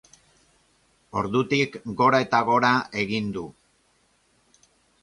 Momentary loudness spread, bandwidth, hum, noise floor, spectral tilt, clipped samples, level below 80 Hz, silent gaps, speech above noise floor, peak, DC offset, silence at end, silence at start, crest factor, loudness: 12 LU; 11.5 kHz; none; -65 dBFS; -5.5 dB/octave; under 0.1%; -60 dBFS; none; 42 dB; -6 dBFS; under 0.1%; 1.5 s; 1.15 s; 20 dB; -23 LUFS